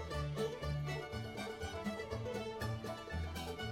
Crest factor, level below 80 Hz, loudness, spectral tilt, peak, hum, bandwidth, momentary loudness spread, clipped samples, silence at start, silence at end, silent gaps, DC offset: 14 dB; -54 dBFS; -42 LUFS; -5.5 dB/octave; -26 dBFS; none; 17.5 kHz; 4 LU; under 0.1%; 0 s; 0 s; none; under 0.1%